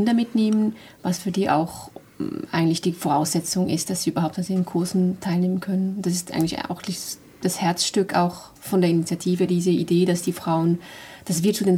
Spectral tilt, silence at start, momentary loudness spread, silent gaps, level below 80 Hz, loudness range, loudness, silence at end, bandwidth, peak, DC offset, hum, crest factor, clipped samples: -5.5 dB/octave; 0 s; 10 LU; none; -60 dBFS; 2 LU; -23 LUFS; 0 s; 16.5 kHz; -6 dBFS; under 0.1%; none; 16 dB; under 0.1%